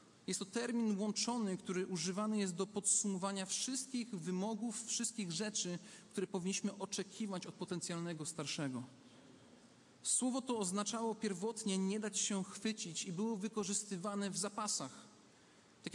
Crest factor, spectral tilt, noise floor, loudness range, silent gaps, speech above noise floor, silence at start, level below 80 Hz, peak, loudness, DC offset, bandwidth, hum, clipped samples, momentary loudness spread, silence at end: 20 dB; -3.5 dB/octave; -65 dBFS; 5 LU; none; 25 dB; 0 s; -86 dBFS; -22 dBFS; -39 LUFS; under 0.1%; 11.5 kHz; none; under 0.1%; 7 LU; 0 s